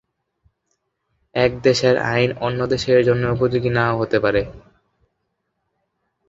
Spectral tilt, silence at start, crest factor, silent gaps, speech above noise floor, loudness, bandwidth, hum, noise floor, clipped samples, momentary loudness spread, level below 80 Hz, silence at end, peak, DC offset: -6 dB/octave; 1.35 s; 18 dB; none; 56 dB; -18 LUFS; 7.8 kHz; none; -74 dBFS; under 0.1%; 6 LU; -46 dBFS; 1.7 s; -2 dBFS; under 0.1%